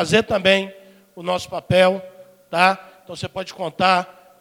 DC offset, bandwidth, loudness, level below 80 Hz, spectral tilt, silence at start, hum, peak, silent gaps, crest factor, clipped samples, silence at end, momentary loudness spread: under 0.1%; 16.5 kHz; -19 LUFS; -52 dBFS; -4.5 dB/octave; 0 s; none; 0 dBFS; none; 20 dB; under 0.1%; 0.3 s; 15 LU